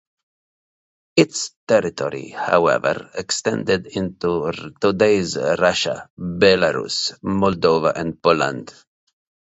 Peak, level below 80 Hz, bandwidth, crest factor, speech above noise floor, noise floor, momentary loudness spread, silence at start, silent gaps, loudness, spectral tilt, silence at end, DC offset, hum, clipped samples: 0 dBFS; -50 dBFS; 8.2 kHz; 20 dB; over 71 dB; under -90 dBFS; 10 LU; 1.15 s; 1.56-1.67 s, 6.10-6.17 s; -19 LUFS; -4.5 dB/octave; 0.85 s; under 0.1%; none; under 0.1%